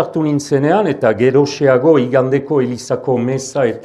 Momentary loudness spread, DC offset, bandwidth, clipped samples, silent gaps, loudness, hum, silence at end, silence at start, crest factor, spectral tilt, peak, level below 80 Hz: 6 LU; under 0.1%; 12 kHz; under 0.1%; none; -14 LUFS; none; 0 s; 0 s; 14 dB; -6.5 dB/octave; 0 dBFS; -58 dBFS